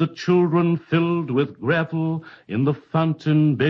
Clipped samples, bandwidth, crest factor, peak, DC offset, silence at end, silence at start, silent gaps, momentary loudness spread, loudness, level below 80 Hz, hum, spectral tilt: under 0.1%; 6.4 kHz; 14 dB; -6 dBFS; under 0.1%; 0 s; 0 s; none; 6 LU; -21 LUFS; -62 dBFS; none; -8.5 dB/octave